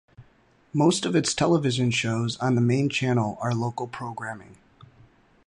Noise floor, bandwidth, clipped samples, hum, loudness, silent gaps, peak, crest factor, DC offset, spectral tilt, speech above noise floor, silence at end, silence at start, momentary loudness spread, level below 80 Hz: -60 dBFS; 11.5 kHz; under 0.1%; none; -24 LUFS; none; -8 dBFS; 16 dB; under 0.1%; -5 dB/octave; 36 dB; 0.95 s; 0.2 s; 11 LU; -60 dBFS